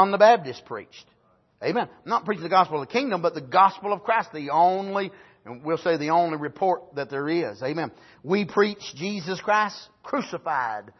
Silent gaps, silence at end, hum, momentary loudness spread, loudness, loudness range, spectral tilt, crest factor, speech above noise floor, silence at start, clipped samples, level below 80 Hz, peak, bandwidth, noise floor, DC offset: none; 0.2 s; none; 13 LU; -24 LUFS; 4 LU; -5.5 dB/octave; 20 dB; 29 dB; 0 s; under 0.1%; -72 dBFS; -4 dBFS; 6.2 kHz; -53 dBFS; under 0.1%